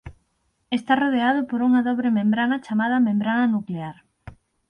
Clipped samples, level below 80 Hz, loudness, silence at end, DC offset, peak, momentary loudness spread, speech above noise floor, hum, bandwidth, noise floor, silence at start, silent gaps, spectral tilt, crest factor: under 0.1%; -56 dBFS; -22 LUFS; 0.4 s; under 0.1%; -8 dBFS; 9 LU; 49 dB; none; 5.4 kHz; -70 dBFS; 0.05 s; none; -7.5 dB/octave; 16 dB